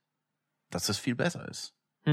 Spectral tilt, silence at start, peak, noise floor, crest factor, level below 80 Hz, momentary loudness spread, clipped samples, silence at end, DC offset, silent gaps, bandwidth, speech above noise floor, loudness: -4.5 dB/octave; 0.7 s; -14 dBFS; -84 dBFS; 20 dB; -68 dBFS; 11 LU; under 0.1%; 0 s; under 0.1%; none; 16.5 kHz; 52 dB; -33 LUFS